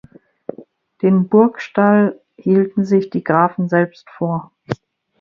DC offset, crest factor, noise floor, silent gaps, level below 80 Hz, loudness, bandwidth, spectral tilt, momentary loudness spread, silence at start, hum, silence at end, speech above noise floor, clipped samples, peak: under 0.1%; 16 dB; -43 dBFS; none; -60 dBFS; -16 LUFS; 6.8 kHz; -9.5 dB/octave; 15 LU; 0.6 s; none; 0.45 s; 27 dB; under 0.1%; 0 dBFS